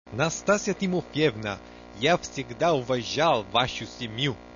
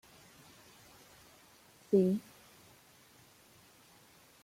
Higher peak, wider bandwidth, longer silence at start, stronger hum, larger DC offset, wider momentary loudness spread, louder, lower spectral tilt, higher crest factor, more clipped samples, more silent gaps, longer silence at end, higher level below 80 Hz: first, -8 dBFS vs -16 dBFS; second, 7.4 kHz vs 16.5 kHz; second, 0.05 s vs 1.9 s; first, 60 Hz at -50 dBFS vs none; neither; second, 11 LU vs 29 LU; first, -26 LUFS vs -31 LUFS; second, -4.5 dB/octave vs -7.5 dB/octave; about the same, 18 dB vs 22 dB; neither; neither; second, 0 s vs 2.25 s; first, -54 dBFS vs -78 dBFS